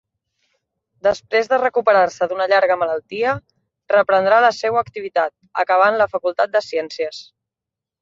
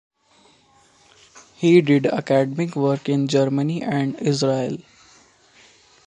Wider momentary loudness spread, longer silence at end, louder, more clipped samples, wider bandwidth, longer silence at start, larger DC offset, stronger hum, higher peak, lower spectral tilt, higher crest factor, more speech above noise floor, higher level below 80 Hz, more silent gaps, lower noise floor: about the same, 9 LU vs 8 LU; second, 0.8 s vs 1.25 s; about the same, -18 LUFS vs -20 LUFS; neither; second, 7.6 kHz vs 9.8 kHz; second, 1.05 s vs 1.35 s; neither; neither; about the same, -2 dBFS vs -2 dBFS; second, -4 dB/octave vs -6.5 dB/octave; about the same, 16 dB vs 20 dB; first, 69 dB vs 37 dB; first, -60 dBFS vs -66 dBFS; neither; first, -86 dBFS vs -56 dBFS